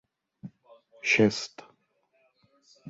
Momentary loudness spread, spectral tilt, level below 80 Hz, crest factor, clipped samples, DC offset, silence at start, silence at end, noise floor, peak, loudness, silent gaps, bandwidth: 26 LU; -4 dB/octave; -70 dBFS; 22 dB; under 0.1%; under 0.1%; 0.45 s; 0 s; -71 dBFS; -10 dBFS; -25 LUFS; none; 8 kHz